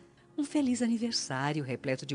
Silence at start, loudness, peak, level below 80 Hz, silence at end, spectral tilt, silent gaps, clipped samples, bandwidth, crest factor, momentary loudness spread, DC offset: 0 s; -32 LUFS; -16 dBFS; -72 dBFS; 0 s; -4.5 dB/octave; none; under 0.1%; 10.5 kHz; 16 dB; 6 LU; under 0.1%